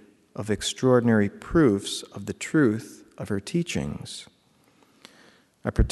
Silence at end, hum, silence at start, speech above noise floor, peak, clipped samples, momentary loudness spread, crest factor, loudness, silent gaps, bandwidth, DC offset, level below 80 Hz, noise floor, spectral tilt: 0 s; none; 0.35 s; 37 dB; -6 dBFS; under 0.1%; 17 LU; 20 dB; -25 LUFS; none; 12 kHz; under 0.1%; -38 dBFS; -62 dBFS; -5.5 dB/octave